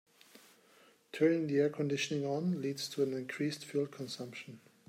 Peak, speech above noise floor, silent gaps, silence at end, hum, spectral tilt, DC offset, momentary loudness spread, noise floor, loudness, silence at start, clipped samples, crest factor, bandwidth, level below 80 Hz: -18 dBFS; 30 dB; none; 0.3 s; none; -5.5 dB/octave; under 0.1%; 13 LU; -65 dBFS; -35 LUFS; 1.15 s; under 0.1%; 18 dB; 16 kHz; -82 dBFS